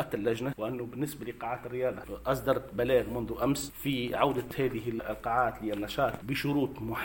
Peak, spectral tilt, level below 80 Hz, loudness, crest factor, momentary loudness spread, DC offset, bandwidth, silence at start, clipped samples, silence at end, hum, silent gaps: -12 dBFS; -5.5 dB/octave; -52 dBFS; -32 LUFS; 20 dB; 7 LU; under 0.1%; 17 kHz; 0 s; under 0.1%; 0 s; none; none